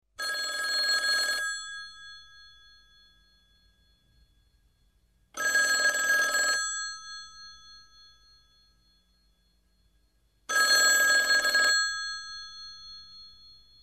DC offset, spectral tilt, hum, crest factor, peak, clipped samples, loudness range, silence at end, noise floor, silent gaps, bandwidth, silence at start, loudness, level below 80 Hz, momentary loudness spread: under 0.1%; 2.5 dB/octave; none; 18 dB; -12 dBFS; under 0.1%; 13 LU; 0.55 s; -68 dBFS; none; 14 kHz; 0.2 s; -24 LUFS; -66 dBFS; 24 LU